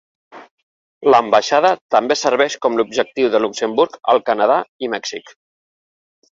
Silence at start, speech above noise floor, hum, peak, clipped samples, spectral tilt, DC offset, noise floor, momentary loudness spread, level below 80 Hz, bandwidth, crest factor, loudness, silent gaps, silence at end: 0.35 s; over 74 dB; none; -2 dBFS; under 0.1%; -3 dB/octave; under 0.1%; under -90 dBFS; 10 LU; -64 dBFS; 7.8 kHz; 16 dB; -16 LUFS; 0.51-1.01 s, 1.81-1.89 s, 4.69-4.79 s; 1.1 s